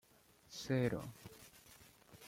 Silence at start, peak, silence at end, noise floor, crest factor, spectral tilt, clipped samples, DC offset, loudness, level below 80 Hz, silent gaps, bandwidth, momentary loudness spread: 0.5 s; -24 dBFS; 0 s; -68 dBFS; 20 dB; -6 dB/octave; under 0.1%; under 0.1%; -41 LUFS; -70 dBFS; none; 16.5 kHz; 24 LU